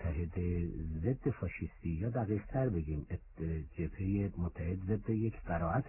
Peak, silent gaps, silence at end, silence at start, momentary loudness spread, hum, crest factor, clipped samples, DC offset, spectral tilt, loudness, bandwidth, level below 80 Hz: -22 dBFS; none; 0 s; 0 s; 6 LU; none; 14 dB; under 0.1%; under 0.1%; -7.5 dB/octave; -37 LUFS; 2.9 kHz; -44 dBFS